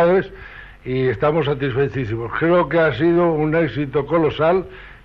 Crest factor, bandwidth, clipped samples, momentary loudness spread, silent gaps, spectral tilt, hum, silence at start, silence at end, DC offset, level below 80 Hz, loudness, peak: 14 dB; 6 kHz; under 0.1%; 12 LU; none; -9.5 dB/octave; none; 0 s; 0.1 s; under 0.1%; -42 dBFS; -19 LUFS; -6 dBFS